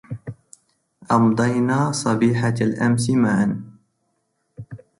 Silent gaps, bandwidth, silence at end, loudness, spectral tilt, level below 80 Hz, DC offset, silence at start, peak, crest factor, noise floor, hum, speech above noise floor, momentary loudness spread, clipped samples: none; 11.5 kHz; 0.2 s; -19 LUFS; -6.5 dB/octave; -56 dBFS; under 0.1%; 0.1 s; -6 dBFS; 16 dB; -71 dBFS; none; 52 dB; 17 LU; under 0.1%